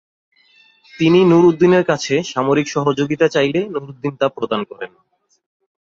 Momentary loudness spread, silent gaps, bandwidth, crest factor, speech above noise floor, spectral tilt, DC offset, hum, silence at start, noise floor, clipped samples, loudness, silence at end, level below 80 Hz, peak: 14 LU; none; 7.6 kHz; 16 dB; 37 dB; -6 dB/octave; under 0.1%; none; 0.95 s; -53 dBFS; under 0.1%; -16 LUFS; 1.05 s; -58 dBFS; -2 dBFS